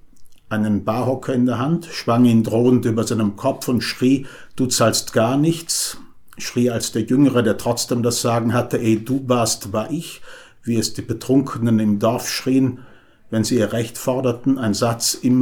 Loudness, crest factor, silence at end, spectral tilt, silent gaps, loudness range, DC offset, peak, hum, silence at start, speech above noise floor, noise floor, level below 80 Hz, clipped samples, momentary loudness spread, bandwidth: -19 LUFS; 16 dB; 0 s; -5 dB/octave; none; 2 LU; under 0.1%; -4 dBFS; none; 0.05 s; 20 dB; -39 dBFS; -52 dBFS; under 0.1%; 8 LU; 20 kHz